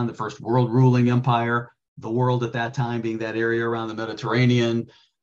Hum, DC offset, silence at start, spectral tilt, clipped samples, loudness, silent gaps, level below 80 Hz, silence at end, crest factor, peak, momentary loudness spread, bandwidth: none; under 0.1%; 0 s; -7.5 dB/octave; under 0.1%; -22 LUFS; 1.88-1.96 s; -60 dBFS; 0.35 s; 16 dB; -6 dBFS; 11 LU; 7.2 kHz